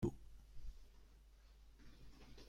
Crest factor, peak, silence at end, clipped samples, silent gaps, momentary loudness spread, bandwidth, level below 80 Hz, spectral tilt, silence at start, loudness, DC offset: 24 dB; -26 dBFS; 0 s; under 0.1%; none; 8 LU; 16 kHz; -58 dBFS; -7.5 dB/octave; 0 s; -58 LUFS; under 0.1%